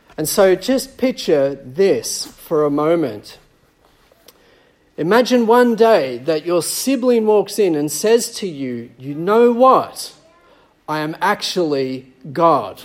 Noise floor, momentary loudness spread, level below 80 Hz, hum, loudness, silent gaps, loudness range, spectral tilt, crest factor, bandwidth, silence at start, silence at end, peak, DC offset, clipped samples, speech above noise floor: -55 dBFS; 13 LU; -58 dBFS; none; -16 LUFS; none; 5 LU; -4.5 dB/octave; 16 dB; 16.5 kHz; 0.2 s; 0 s; 0 dBFS; under 0.1%; under 0.1%; 39 dB